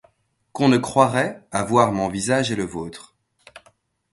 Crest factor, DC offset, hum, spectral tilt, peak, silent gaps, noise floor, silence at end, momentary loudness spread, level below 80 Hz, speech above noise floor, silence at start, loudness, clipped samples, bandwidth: 20 dB; under 0.1%; none; -5 dB/octave; -2 dBFS; none; -63 dBFS; 0.55 s; 16 LU; -54 dBFS; 43 dB; 0.55 s; -20 LUFS; under 0.1%; 11.5 kHz